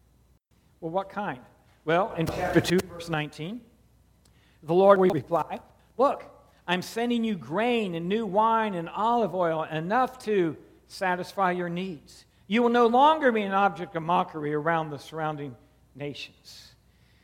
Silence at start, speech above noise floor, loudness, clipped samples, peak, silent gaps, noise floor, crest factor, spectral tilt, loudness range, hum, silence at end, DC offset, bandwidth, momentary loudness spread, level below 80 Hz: 0.8 s; 37 dB; -26 LUFS; under 0.1%; -4 dBFS; none; -63 dBFS; 22 dB; -6 dB/octave; 5 LU; none; 0.65 s; under 0.1%; 17.5 kHz; 18 LU; -58 dBFS